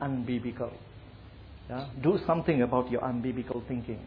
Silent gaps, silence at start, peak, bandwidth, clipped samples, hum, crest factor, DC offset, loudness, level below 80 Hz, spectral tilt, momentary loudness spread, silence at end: none; 0 s; -12 dBFS; 5.2 kHz; under 0.1%; none; 18 dB; under 0.1%; -31 LUFS; -52 dBFS; -10.5 dB/octave; 23 LU; 0 s